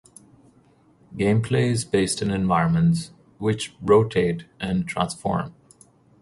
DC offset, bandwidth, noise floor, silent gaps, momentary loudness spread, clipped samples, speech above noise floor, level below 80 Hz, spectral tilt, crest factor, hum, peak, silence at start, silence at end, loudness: under 0.1%; 11.5 kHz; -57 dBFS; none; 9 LU; under 0.1%; 36 dB; -48 dBFS; -6 dB/octave; 18 dB; none; -6 dBFS; 1.1 s; 0.7 s; -23 LUFS